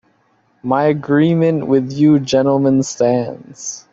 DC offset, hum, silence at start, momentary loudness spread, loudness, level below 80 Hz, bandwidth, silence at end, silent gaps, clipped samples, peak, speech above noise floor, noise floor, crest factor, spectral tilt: under 0.1%; none; 0.65 s; 14 LU; -15 LUFS; -56 dBFS; 7.8 kHz; 0.15 s; none; under 0.1%; -2 dBFS; 44 dB; -58 dBFS; 12 dB; -6.5 dB/octave